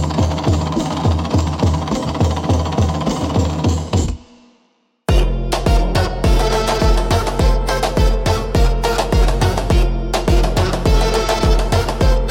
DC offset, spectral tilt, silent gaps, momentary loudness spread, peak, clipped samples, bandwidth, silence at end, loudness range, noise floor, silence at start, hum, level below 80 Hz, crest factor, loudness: under 0.1%; -6 dB/octave; none; 3 LU; -2 dBFS; under 0.1%; 16 kHz; 0 s; 3 LU; -60 dBFS; 0 s; none; -18 dBFS; 12 dB; -17 LUFS